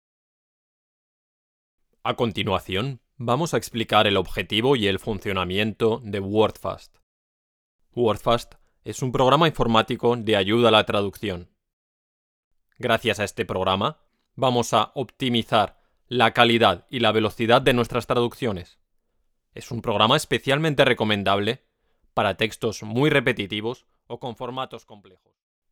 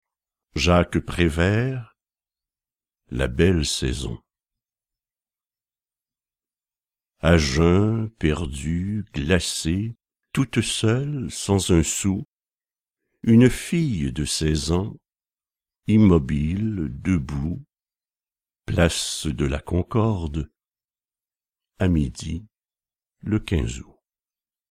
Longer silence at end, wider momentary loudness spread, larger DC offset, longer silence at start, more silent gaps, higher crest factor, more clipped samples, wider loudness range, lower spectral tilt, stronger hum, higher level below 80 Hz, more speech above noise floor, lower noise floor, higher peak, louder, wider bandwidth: second, 0.75 s vs 0.9 s; about the same, 14 LU vs 14 LU; neither; first, 2.05 s vs 0.55 s; first, 7.03-7.79 s, 11.73-12.51 s vs 12.27-12.39 s; about the same, 24 dB vs 20 dB; neither; about the same, 6 LU vs 6 LU; about the same, -5 dB/octave vs -5.5 dB/octave; neither; second, -48 dBFS vs -36 dBFS; second, 48 dB vs over 69 dB; second, -70 dBFS vs under -90 dBFS; about the same, 0 dBFS vs -2 dBFS; about the same, -22 LUFS vs -22 LUFS; first, 18 kHz vs 15 kHz